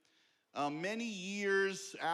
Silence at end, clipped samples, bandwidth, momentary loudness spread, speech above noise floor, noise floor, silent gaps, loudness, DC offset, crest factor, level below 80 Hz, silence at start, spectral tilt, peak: 0 s; under 0.1%; 13.5 kHz; 7 LU; 37 dB; -74 dBFS; none; -37 LUFS; under 0.1%; 14 dB; under -90 dBFS; 0.55 s; -3.5 dB/octave; -24 dBFS